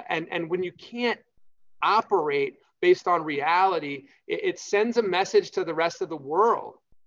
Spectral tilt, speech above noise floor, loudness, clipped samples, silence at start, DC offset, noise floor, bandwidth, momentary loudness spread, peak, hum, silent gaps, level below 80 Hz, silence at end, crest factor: -4.5 dB/octave; 33 dB; -25 LUFS; under 0.1%; 0 s; under 0.1%; -58 dBFS; 7.6 kHz; 11 LU; -8 dBFS; none; none; -76 dBFS; 0.35 s; 16 dB